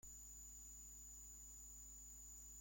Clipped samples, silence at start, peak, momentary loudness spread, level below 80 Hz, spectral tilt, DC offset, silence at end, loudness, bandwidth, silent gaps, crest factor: under 0.1%; 0.05 s; -48 dBFS; 0 LU; -64 dBFS; -2 dB/octave; under 0.1%; 0 s; -56 LUFS; 16.5 kHz; none; 10 dB